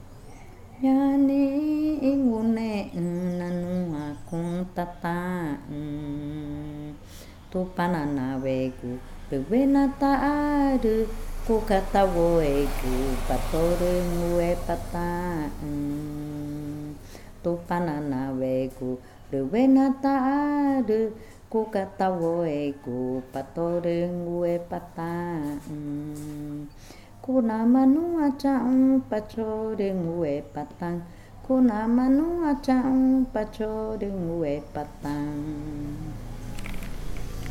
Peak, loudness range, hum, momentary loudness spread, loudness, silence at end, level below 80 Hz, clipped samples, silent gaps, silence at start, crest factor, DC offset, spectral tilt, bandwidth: -8 dBFS; 7 LU; none; 14 LU; -26 LUFS; 0 s; -38 dBFS; under 0.1%; none; 0 s; 18 dB; under 0.1%; -7.5 dB/octave; 16 kHz